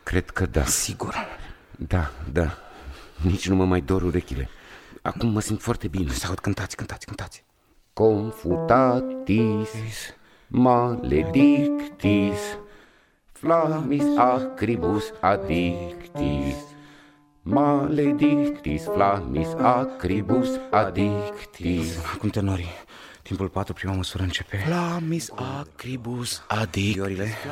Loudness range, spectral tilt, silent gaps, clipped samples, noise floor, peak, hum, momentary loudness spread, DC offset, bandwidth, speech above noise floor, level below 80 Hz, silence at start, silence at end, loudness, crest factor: 6 LU; -6 dB/octave; none; under 0.1%; -61 dBFS; -4 dBFS; none; 14 LU; under 0.1%; 16 kHz; 38 dB; -40 dBFS; 0.05 s; 0 s; -24 LUFS; 20 dB